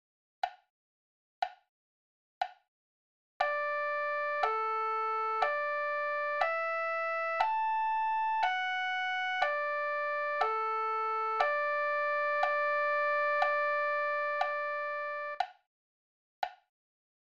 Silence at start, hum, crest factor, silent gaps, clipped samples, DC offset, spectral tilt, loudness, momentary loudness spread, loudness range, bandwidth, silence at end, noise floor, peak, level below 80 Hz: 0.45 s; none; 20 dB; 0.70-1.42 s, 1.69-2.41 s, 2.68-3.40 s, 15.67-16.42 s; under 0.1%; 0.1%; 0 dB/octave; -32 LUFS; 10 LU; 7 LU; 7.6 kHz; 0.7 s; under -90 dBFS; -14 dBFS; -78 dBFS